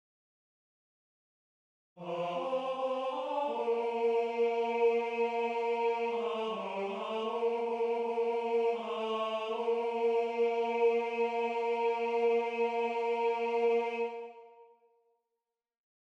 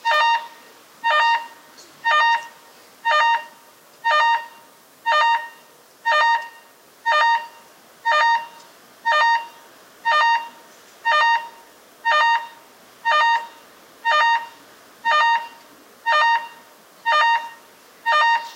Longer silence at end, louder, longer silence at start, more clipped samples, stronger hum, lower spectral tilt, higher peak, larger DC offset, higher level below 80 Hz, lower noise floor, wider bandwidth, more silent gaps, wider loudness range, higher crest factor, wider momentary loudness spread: first, 1.4 s vs 0 s; second, -32 LUFS vs -19 LUFS; first, 1.95 s vs 0.05 s; neither; neither; first, -5 dB/octave vs 1.5 dB/octave; second, -18 dBFS vs -6 dBFS; neither; about the same, -88 dBFS vs -84 dBFS; first, -89 dBFS vs -49 dBFS; second, 7.6 kHz vs 16 kHz; neither; first, 4 LU vs 0 LU; about the same, 14 dB vs 16 dB; second, 6 LU vs 21 LU